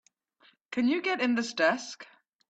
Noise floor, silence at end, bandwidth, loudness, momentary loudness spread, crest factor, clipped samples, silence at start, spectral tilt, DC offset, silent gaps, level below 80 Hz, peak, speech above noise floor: -65 dBFS; 0.5 s; 8.4 kHz; -28 LUFS; 13 LU; 20 dB; under 0.1%; 0.7 s; -3.5 dB/octave; under 0.1%; none; -78 dBFS; -10 dBFS; 37 dB